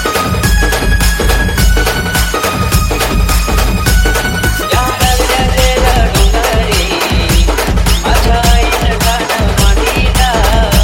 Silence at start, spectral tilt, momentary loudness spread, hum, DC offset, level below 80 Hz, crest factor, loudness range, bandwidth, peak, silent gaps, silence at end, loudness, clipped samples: 0 s; -4 dB/octave; 2 LU; none; under 0.1%; -12 dBFS; 10 dB; 1 LU; 17 kHz; 0 dBFS; none; 0 s; -11 LUFS; under 0.1%